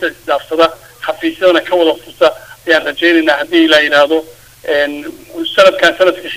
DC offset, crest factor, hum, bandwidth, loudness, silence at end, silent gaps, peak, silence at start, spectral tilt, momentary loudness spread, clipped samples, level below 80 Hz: 0.3%; 12 dB; none; 16 kHz; -12 LUFS; 0 s; none; 0 dBFS; 0 s; -3 dB/octave; 14 LU; 0.3%; -52 dBFS